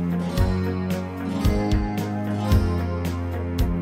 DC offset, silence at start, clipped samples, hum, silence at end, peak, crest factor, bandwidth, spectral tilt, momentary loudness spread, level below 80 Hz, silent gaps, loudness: under 0.1%; 0 s; under 0.1%; none; 0 s; -6 dBFS; 16 dB; 16.5 kHz; -7.5 dB/octave; 6 LU; -30 dBFS; none; -25 LUFS